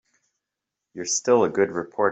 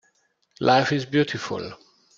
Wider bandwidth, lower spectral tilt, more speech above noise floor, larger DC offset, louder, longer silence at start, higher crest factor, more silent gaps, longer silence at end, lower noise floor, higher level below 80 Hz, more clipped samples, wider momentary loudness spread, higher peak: about the same, 8.2 kHz vs 7.6 kHz; second, -3.5 dB/octave vs -5.5 dB/octave; first, 63 dB vs 45 dB; neither; about the same, -22 LUFS vs -23 LUFS; first, 0.95 s vs 0.6 s; about the same, 18 dB vs 22 dB; neither; second, 0 s vs 0.4 s; first, -85 dBFS vs -68 dBFS; second, -70 dBFS vs -64 dBFS; neither; about the same, 13 LU vs 13 LU; about the same, -6 dBFS vs -4 dBFS